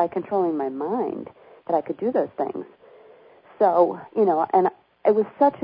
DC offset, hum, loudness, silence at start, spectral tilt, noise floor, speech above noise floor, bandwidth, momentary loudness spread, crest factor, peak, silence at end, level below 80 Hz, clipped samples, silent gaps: under 0.1%; none; -23 LUFS; 0 s; -11.5 dB/octave; -50 dBFS; 29 dB; 5.2 kHz; 13 LU; 18 dB; -6 dBFS; 0 s; -72 dBFS; under 0.1%; none